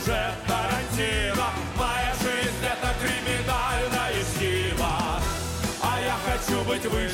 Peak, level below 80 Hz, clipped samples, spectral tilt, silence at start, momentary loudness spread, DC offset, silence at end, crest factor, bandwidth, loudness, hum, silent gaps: -14 dBFS; -34 dBFS; under 0.1%; -4 dB/octave; 0 s; 2 LU; under 0.1%; 0 s; 12 dB; 17 kHz; -26 LUFS; none; none